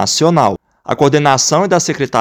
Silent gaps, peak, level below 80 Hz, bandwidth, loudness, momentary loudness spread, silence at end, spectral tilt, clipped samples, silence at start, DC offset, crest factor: none; 0 dBFS; -52 dBFS; 17.5 kHz; -12 LUFS; 7 LU; 0 s; -4 dB/octave; 0.3%; 0 s; under 0.1%; 12 dB